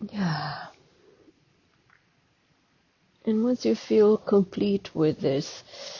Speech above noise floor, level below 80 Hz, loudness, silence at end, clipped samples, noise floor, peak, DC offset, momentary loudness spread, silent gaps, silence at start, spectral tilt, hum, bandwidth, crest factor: 42 dB; -64 dBFS; -25 LUFS; 0 s; under 0.1%; -67 dBFS; -10 dBFS; under 0.1%; 16 LU; none; 0 s; -6.5 dB/octave; none; 7.2 kHz; 16 dB